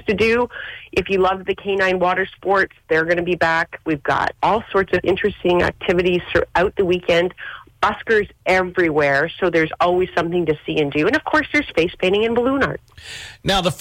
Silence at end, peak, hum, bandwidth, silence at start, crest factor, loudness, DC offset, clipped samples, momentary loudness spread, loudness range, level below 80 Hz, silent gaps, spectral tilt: 0 s; -8 dBFS; none; 16 kHz; 0.05 s; 12 dB; -19 LUFS; under 0.1%; under 0.1%; 6 LU; 1 LU; -44 dBFS; none; -5.5 dB/octave